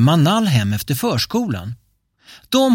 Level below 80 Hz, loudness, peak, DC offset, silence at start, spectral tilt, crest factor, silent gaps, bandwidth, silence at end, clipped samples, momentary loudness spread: -50 dBFS; -18 LUFS; -4 dBFS; under 0.1%; 0 s; -5.5 dB/octave; 14 dB; none; 17 kHz; 0 s; under 0.1%; 13 LU